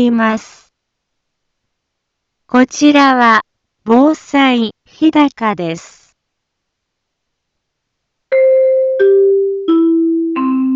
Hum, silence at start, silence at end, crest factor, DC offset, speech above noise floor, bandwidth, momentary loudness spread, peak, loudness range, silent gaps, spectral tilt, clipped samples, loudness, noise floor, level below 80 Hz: none; 0 s; 0 s; 14 dB; under 0.1%; 62 dB; 7.8 kHz; 8 LU; 0 dBFS; 7 LU; none; -4.5 dB/octave; under 0.1%; -12 LUFS; -74 dBFS; -60 dBFS